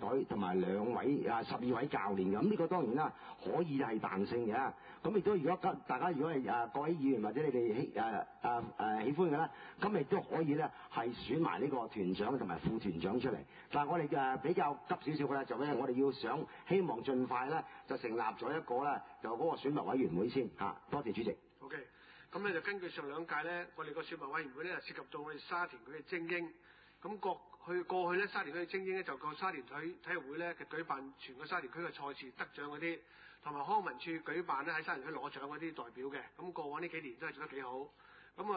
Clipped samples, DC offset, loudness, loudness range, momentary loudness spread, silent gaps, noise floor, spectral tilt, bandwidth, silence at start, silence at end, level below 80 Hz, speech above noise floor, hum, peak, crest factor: under 0.1%; under 0.1%; -39 LUFS; 6 LU; 11 LU; none; -60 dBFS; -5 dB/octave; 4.9 kHz; 0 s; 0 s; -72 dBFS; 22 dB; none; -22 dBFS; 18 dB